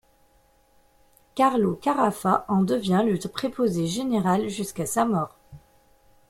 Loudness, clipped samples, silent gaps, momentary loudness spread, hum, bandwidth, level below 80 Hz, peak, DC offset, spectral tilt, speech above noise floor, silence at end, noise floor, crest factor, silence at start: -24 LUFS; under 0.1%; none; 7 LU; none; 16 kHz; -58 dBFS; -6 dBFS; under 0.1%; -6 dB/octave; 38 dB; 0.7 s; -61 dBFS; 20 dB; 1.35 s